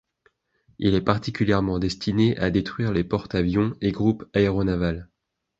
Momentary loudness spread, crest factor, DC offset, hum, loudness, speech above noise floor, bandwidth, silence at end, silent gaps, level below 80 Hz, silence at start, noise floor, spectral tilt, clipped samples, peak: 4 LU; 20 dB; under 0.1%; none; -23 LUFS; 43 dB; 8 kHz; 0.55 s; none; -42 dBFS; 0.8 s; -66 dBFS; -7.5 dB/octave; under 0.1%; -4 dBFS